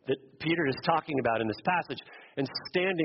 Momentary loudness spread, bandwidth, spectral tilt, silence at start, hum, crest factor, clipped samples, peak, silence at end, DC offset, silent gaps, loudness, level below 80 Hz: 9 LU; 5.8 kHz; -3.5 dB/octave; 0.05 s; none; 20 dB; under 0.1%; -10 dBFS; 0 s; under 0.1%; none; -30 LUFS; -66 dBFS